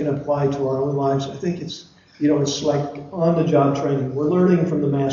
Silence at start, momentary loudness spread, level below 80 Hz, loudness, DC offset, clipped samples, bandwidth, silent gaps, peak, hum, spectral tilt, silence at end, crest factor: 0 s; 9 LU; -54 dBFS; -20 LUFS; under 0.1%; under 0.1%; 7.4 kHz; none; -4 dBFS; none; -7 dB/octave; 0 s; 16 dB